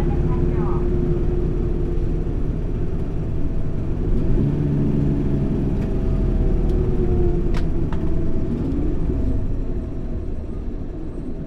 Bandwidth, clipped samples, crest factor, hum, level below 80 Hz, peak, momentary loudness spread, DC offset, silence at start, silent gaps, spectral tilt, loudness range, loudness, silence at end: 4.9 kHz; under 0.1%; 12 dB; none; -22 dBFS; -6 dBFS; 9 LU; under 0.1%; 0 s; none; -10 dB/octave; 4 LU; -24 LUFS; 0 s